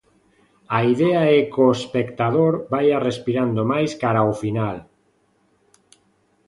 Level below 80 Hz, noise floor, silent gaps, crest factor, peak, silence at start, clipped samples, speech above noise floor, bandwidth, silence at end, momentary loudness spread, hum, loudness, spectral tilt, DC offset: -58 dBFS; -63 dBFS; none; 18 dB; -4 dBFS; 0.7 s; under 0.1%; 44 dB; 11.5 kHz; 1.65 s; 8 LU; none; -20 LUFS; -7 dB/octave; under 0.1%